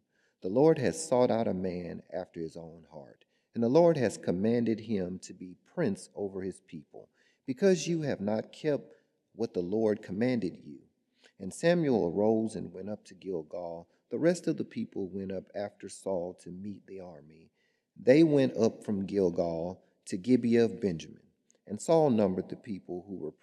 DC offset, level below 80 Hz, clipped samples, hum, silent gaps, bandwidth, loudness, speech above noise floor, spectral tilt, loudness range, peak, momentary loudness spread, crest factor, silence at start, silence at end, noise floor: under 0.1%; -76 dBFS; under 0.1%; none; none; 12 kHz; -30 LUFS; 37 dB; -6.5 dB/octave; 6 LU; -10 dBFS; 18 LU; 22 dB; 0.45 s; 0.1 s; -67 dBFS